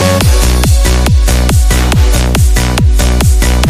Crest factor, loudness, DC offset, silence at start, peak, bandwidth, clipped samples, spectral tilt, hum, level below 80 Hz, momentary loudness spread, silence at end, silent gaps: 8 dB; -10 LUFS; under 0.1%; 0 s; 0 dBFS; 16 kHz; under 0.1%; -4.5 dB/octave; none; -10 dBFS; 1 LU; 0 s; none